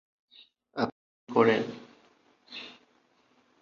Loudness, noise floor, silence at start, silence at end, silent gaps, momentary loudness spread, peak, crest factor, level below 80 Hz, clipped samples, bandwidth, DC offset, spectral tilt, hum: -28 LUFS; -67 dBFS; 0.75 s; 0.9 s; 0.92-1.27 s; 22 LU; -8 dBFS; 24 dB; -74 dBFS; under 0.1%; 7 kHz; under 0.1%; -6.5 dB/octave; none